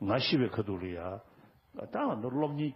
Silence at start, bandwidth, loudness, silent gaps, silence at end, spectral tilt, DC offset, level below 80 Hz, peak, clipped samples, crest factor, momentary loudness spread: 0 s; 5.8 kHz; -33 LUFS; none; 0 s; -9 dB/octave; under 0.1%; -66 dBFS; -14 dBFS; under 0.1%; 18 dB; 18 LU